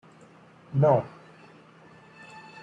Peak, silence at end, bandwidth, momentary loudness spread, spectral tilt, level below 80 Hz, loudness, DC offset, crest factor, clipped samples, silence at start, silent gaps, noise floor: -8 dBFS; 0.25 s; 7.8 kHz; 25 LU; -9.5 dB/octave; -68 dBFS; -24 LUFS; under 0.1%; 22 dB; under 0.1%; 0.7 s; none; -53 dBFS